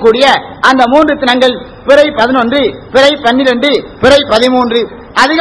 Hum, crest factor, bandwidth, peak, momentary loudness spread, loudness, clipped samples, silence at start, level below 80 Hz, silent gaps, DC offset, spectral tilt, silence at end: none; 8 dB; 11 kHz; 0 dBFS; 5 LU; -8 LUFS; 4%; 0 s; -38 dBFS; none; under 0.1%; -4 dB/octave; 0 s